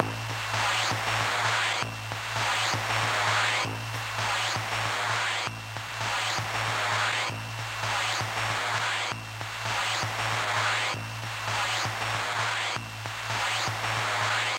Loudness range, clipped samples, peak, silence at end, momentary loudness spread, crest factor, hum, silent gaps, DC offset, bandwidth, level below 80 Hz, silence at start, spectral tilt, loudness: 2 LU; under 0.1%; -6 dBFS; 0 s; 7 LU; 22 dB; none; none; under 0.1%; 16 kHz; -58 dBFS; 0 s; -2 dB/octave; -28 LUFS